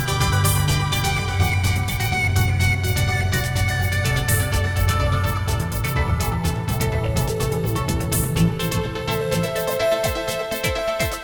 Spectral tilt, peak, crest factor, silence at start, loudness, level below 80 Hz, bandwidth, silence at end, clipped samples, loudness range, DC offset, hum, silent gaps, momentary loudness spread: -4.5 dB/octave; -8 dBFS; 12 dB; 0 s; -21 LUFS; -30 dBFS; over 20 kHz; 0 s; under 0.1%; 2 LU; under 0.1%; none; none; 4 LU